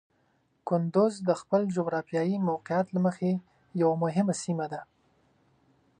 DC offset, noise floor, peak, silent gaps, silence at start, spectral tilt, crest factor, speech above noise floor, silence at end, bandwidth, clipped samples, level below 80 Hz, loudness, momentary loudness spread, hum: under 0.1%; -70 dBFS; -12 dBFS; none; 0.65 s; -7 dB/octave; 18 dB; 43 dB; 1.15 s; 10 kHz; under 0.1%; -74 dBFS; -29 LUFS; 8 LU; none